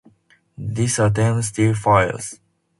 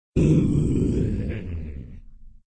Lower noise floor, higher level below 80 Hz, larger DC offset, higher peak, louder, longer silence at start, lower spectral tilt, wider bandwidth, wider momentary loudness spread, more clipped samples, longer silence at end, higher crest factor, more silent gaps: first, -57 dBFS vs -43 dBFS; second, -46 dBFS vs -32 dBFS; neither; first, 0 dBFS vs -8 dBFS; first, -19 LUFS vs -23 LUFS; first, 0.6 s vs 0.15 s; second, -5.5 dB/octave vs -9 dB/octave; first, 11.5 kHz vs 9 kHz; second, 14 LU vs 19 LU; neither; first, 0.45 s vs 0.2 s; first, 20 dB vs 14 dB; neither